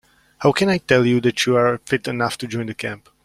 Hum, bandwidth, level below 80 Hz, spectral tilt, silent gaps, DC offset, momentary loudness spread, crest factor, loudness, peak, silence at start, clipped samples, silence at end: none; 15 kHz; -54 dBFS; -5 dB/octave; none; under 0.1%; 10 LU; 18 dB; -19 LUFS; -2 dBFS; 0.4 s; under 0.1%; 0.3 s